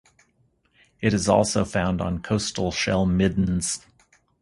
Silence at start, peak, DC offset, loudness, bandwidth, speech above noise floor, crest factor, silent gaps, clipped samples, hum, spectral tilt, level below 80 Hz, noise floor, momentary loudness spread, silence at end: 1 s; -4 dBFS; under 0.1%; -23 LUFS; 11.5 kHz; 43 dB; 20 dB; none; under 0.1%; none; -5 dB/octave; -42 dBFS; -66 dBFS; 7 LU; 0.65 s